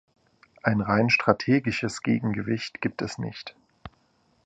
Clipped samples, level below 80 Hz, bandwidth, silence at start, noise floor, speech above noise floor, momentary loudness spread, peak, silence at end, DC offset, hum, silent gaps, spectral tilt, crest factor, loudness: under 0.1%; -56 dBFS; 9.6 kHz; 0.65 s; -66 dBFS; 41 dB; 13 LU; -2 dBFS; 0.55 s; under 0.1%; none; none; -6 dB/octave; 24 dB; -25 LUFS